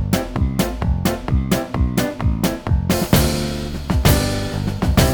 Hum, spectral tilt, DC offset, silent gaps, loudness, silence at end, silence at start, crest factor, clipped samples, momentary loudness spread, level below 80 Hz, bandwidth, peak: none; -5.5 dB/octave; under 0.1%; none; -19 LUFS; 0 s; 0 s; 18 dB; under 0.1%; 6 LU; -24 dBFS; over 20 kHz; 0 dBFS